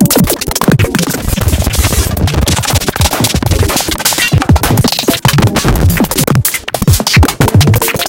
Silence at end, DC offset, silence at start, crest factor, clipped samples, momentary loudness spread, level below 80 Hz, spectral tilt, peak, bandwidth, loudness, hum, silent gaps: 0 s; under 0.1%; 0 s; 10 dB; 0.2%; 4 LU; -18 dBFS; -4.5 dB/octave; 0 dBFS; 17.5 kHz; -10 LUFS; none; none